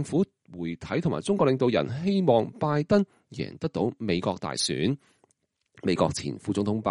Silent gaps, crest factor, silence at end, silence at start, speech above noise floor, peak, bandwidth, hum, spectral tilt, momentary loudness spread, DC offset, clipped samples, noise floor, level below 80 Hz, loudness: none; 18 dB; 0 s; 0 s; 47 dB; -8 dBFS; 11.5 kHz; none; -6 dB/octave; 11 LU; under 0.1%; under 0.1%; -73 dBFS; -58 dBFS; -27 LUFS